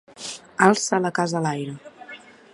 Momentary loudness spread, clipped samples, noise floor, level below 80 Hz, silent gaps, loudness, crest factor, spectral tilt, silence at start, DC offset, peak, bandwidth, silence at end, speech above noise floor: 23 LU; under 0.1%; -44 dBFS; -68 dBFS; none; -22 LUFS; 24 dB; -4.5 dB/octave; 0.2 s; under 0.1%; 0 dBFS; 11.5 kHz; 0.35 s; 23 dB